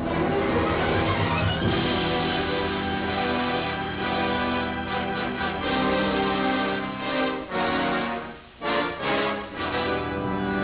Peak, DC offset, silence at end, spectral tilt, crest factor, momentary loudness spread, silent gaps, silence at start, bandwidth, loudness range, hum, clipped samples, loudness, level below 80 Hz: -10 dBFS; under 0.1%; 0 s; -3.5 dB/octave; 14 dB; 4 LU; none; 0 s; 4 kHz; 2 LU; none; under 0.1%; -25 LUFS; -42 dBFS